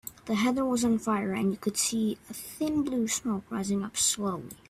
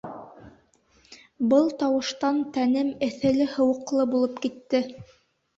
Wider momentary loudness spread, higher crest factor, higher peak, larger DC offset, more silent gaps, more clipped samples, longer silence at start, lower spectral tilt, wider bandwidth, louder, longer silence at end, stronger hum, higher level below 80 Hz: about the same, 7 LU vs 8 LU; about the same, 16 dB vs 16 dB; second, -14 dBFS vs -8 dBFS; neither; neither; neither; about the same, 0.05 s vs 0.05 s; second, -3.5 dB/octave vs -5.5 dB/octave; first, 16 kHz vs 7.8 kHz; second, -29 LUFS vs -24 LUFS; second, 0.15 s vs 0.55 s; neither; about the same, -60 dBFS vs -62 dBFS